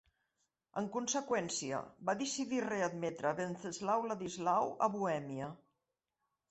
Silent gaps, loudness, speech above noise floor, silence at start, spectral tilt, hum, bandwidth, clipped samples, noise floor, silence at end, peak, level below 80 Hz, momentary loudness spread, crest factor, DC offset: none; -37 LUFS; 51 dB; 0.75 s; -4 dB/octave; none; 8.2 kHz; under 0.1%; -88 dBFS; 0.95 s; -18 dBFS; -78 dBFS; 7 LU; 20 dB; under 0.1%